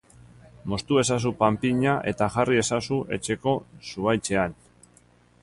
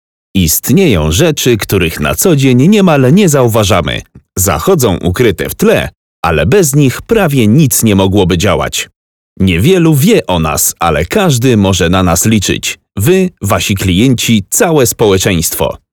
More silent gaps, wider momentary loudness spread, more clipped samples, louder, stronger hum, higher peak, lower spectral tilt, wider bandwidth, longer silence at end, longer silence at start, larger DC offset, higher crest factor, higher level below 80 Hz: second, none vs 5.97-6.23 s, 8.96-9.36 s; about the same, 8 LU vs 6 LU; second, under 0.1% vs 0.7%; second, -25 LUFS vs -9 LUFS; first, 60 Hz at -45 dBFS vs none; second, -6 dBFS vs 0 dBFS; about the same, -5 dB/octave vs -5 dB/octave; second, 11.5 kHz vs over 20 kHz; first, 0.9 s vs 0.15 s; first, 0.65 s vs 0.35 s; neither; first, 20 dB vs 10 dB; second, -52 dBFS vs -30 dBFS